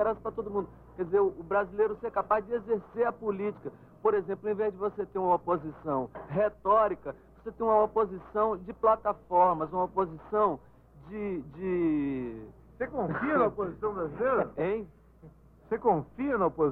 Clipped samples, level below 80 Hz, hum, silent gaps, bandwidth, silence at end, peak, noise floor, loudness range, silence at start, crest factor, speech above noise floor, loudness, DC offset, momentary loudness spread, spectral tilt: under 0.1%; -56 dBFS; none; none; 4.1 kHz; 0 s; -12 dBFS; -54 dBFS; 4 LU; 0 s; 16 dB; 25 dB; -30 LUFS; under 0.1%; 11 LU; -10 dB/octave